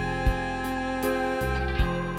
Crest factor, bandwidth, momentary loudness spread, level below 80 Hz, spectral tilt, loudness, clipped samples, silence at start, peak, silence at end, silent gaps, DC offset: 16 dB; 17 kHz; 3 LU; -32 dBFS; -6 dB/octave; -28 LUFS; under 0.1%; 0 s; -12 dBFS; 0 s; none; under 0.1%